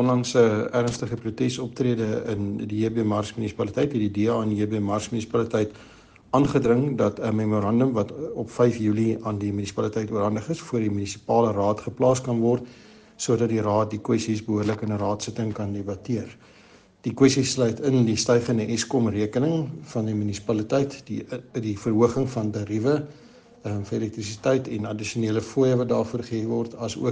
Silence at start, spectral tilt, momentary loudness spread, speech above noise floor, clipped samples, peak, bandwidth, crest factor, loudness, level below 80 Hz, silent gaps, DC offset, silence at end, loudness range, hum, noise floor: 0 s; -6 dB/octave; 9 LU; 29 dB; under 0.1%; -4 dBFS; 10 kHz; 20 dB; -25 LUFS; -58 dBFS; none; under 0.1%; 0 s; 3 LU; none; -53 dBFS